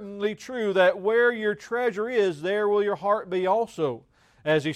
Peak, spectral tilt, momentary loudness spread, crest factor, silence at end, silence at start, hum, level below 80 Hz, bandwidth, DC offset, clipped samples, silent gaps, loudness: -10 dBFS; -5.5 dB/octave; 9 LU; 16 dB; 0 s; 0 s; none; -68 dBFS; 10.5 kHz; under 0.1%; under 0.1%; none; -25 LUFS